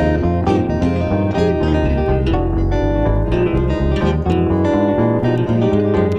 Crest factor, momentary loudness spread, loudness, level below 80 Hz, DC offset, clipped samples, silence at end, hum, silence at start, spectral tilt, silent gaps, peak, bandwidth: 14 dB; 2 LU; -16 LUFS; -24 dBFS; under 0.1%; under 0.1%; 0 s; none; 0 s; -9 dB/octave; none; -2 dBFS; 8.4 kHz